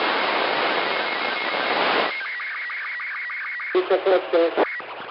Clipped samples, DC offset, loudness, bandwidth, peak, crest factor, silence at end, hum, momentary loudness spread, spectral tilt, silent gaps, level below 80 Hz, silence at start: under 0.1%; under 0.1%; -23 LUFS; 5.8 kHz; -8 dBFS; 16 dB; 0 s; none; 8 LU; -7 dB/octave; none; -76 dBFS; 0 s